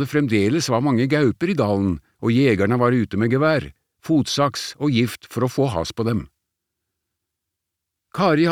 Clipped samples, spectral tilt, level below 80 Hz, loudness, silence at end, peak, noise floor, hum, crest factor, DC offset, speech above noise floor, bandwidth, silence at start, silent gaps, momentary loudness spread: under 0.1%; -6 dB/octave; -50 dBFS; -20 LUFS; 0 s; -4 dBFS; -82 dBFS; none; 16 dB; under 0.1%; 62 dB; 16.5 kHz; 0 s; none; 7 LU